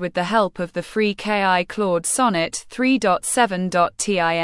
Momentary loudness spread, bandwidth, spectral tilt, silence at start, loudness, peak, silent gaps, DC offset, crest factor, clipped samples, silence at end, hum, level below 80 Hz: 5 LU; 12 kHz; -3.5 dB/octave; 0 s; -20 LUFS; -4 dBFS; none; under 0.1%; 16 dB; under 0.1%; 0 s; none; -54 dBFS